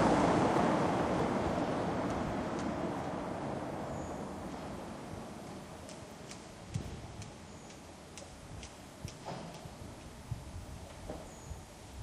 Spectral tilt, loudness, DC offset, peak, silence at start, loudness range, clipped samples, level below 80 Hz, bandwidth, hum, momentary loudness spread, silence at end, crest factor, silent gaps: -6 dB/octave; -37 LUFS; under 0.1%; -16 dBFS; 0 s; 13 LU; under 0.1%; -54 dBFS; 15 kHz; none; 18 LU; 0 s; 20 dB; none